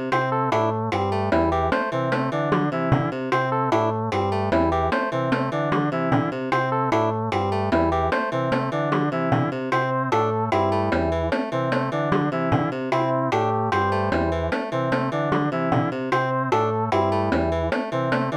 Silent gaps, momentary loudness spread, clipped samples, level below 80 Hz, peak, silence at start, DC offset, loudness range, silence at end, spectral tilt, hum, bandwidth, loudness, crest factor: none; 2 LU; under 0.1%; -46 dBFS; -6 dBFS; 0 s; under 0.1%; 0 LU; 0 s; -7.5 dB/octave; none; 11 kHz; -23 LUFS; 16 dB